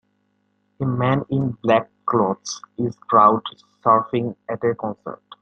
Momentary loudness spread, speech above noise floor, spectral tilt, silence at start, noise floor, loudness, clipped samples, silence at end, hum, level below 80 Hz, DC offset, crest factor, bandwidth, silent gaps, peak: 14 LU; 47 dB; -6.5 dB/octave; 0.8 s; -68 dBFS; -21 LUFS; under 0.1%; 0.25 s; none; -60 dBFS; under 0.1%; 20 dB; 8.6 kHz; none; -2 dBFS